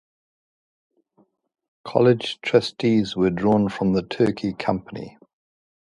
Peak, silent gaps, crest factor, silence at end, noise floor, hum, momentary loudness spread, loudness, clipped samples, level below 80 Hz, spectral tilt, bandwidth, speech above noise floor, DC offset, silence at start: -2 dBFS; none; 22 dB; 0.9 s; -63 dBFS; none; 14 LU; -21 LUFS; under 0.1%; -54 dBFS; -7 dB/octave; 11.5 kHz; 42 dB; under 0.1%; 1.85 s